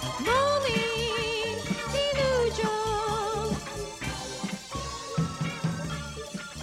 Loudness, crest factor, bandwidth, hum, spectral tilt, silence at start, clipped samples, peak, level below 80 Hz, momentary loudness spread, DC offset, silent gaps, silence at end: -29 LUFS; 14 dB; 16 kHz; none; -4 dB/octave; 0 s; under 0.1%; -14 dBFS; -46 dBFS; 10 LU; under 0.1%; none; 0 s